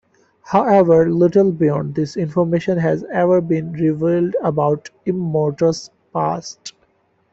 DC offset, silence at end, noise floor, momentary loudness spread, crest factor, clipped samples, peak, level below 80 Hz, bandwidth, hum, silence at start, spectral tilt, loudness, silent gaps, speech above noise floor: under 0.1%; 0.6 s; -61 dBFS; 10 LU; 16 dB; under 0.1%; -2 dBFS; -54 dBFS; 8 kHz; none; 0.45 s; -7.5 dB/octave; -17 LUFS; none; 44 dB